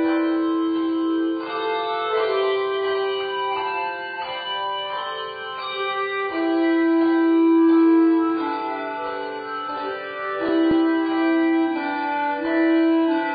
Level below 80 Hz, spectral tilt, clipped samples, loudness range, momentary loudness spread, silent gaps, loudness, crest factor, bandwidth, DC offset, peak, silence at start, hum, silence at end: -64 dBFS; -1.5 dB/octave; under 0.1%; 6 LU; 11 LU; none; -22 LUFS; 12 dB; 4.9 kHz; under 0.1%; -10 dBFS; 0 s; none; 0 s